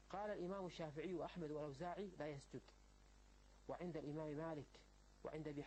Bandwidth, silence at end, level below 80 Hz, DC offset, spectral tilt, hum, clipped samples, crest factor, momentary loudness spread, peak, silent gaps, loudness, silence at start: 8.4 kHz; 0 s; -70 dBFS; under 0.1%; -7 dB/octave; none; under 0.1%; 16 dB; 11 LU; -36 dBFS; none; -51 LUFS; 0 s